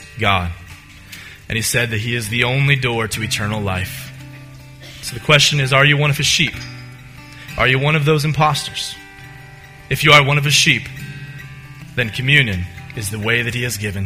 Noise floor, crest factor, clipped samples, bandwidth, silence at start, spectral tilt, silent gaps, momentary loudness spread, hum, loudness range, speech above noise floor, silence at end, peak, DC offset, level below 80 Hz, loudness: -39 dBFS; 18 dB; under 0.1%; 16 kHz; 0 s; -3.5 dB/octave; none; 23 LU; none; 4 LU; 23 dB; 0 s; 0 dBFS; under 0.1%; -42 dBFS; -15 LUFS